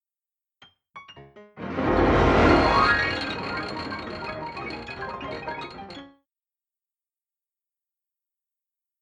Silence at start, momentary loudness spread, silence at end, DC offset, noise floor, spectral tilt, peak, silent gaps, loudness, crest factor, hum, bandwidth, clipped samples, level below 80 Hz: 0.95 s; 21 LU; 2.95 s; under 0.1%; under -90 dBFS; -6.5 dB/octave; -6 dBFS; none; -24 LUFS; 20 dB; none; 9.6 kHz; under 0.1%; -40 dBFS